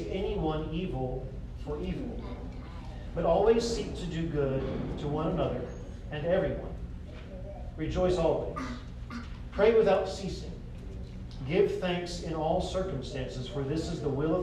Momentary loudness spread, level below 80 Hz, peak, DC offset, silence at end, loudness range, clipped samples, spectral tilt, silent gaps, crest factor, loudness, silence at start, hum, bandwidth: 17 LU; -42 dBFS; -12 dBFS; under 0.1%; 0 s; 4 LU; under 0.1%; -6.5 dB/octave; none; 20 dB; -31 LUFS; 0 s; none; 11 kHz